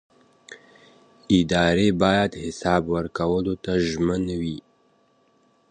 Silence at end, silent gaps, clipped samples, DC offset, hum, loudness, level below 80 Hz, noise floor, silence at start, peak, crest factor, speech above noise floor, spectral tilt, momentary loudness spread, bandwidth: 1.1 s; none; under 0.1%; under 0.1%; none; -22 LUFS; -44 dBFS; -62 dBFS; 0.5 s; -4 dBFS; 20 dB; 40 dB; -6 dB/octave; 9 LU; 9.8 kHz